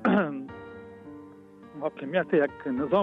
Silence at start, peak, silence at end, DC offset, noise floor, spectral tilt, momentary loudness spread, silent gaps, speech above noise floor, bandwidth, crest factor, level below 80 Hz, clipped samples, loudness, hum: 0 s; -12 dBFS; 0 s; under 0.1%; -49 dBFS; -9 dB/octave; 22 LU; none; 23 dB; 5.6 kHz; 16 dB; -66 dBFS; under 0.1%; -28 LUFS; none